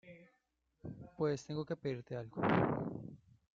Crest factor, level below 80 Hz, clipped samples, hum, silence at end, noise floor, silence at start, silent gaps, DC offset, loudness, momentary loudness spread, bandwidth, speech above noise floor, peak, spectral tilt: 22 dB; -68 dBFS; under 0.1%; none; 0.4 s; -80 dBFS; 0.05 s; none; under 0.1%; -38 LUFS; 19 LU; 7.6 kHz; 43 dB; -18 dBFS; -6.5 dB/octave